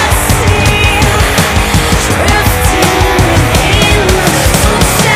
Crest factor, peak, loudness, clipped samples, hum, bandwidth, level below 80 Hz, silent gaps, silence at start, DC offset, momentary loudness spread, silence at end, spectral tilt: 8 dB; 0 dBFS; -8 LUFS; 0.8%; none; 16 kHz; -16 dBFS; none; 0 s; under 0.1%; 2 LU; 0 s; -4 dB/octave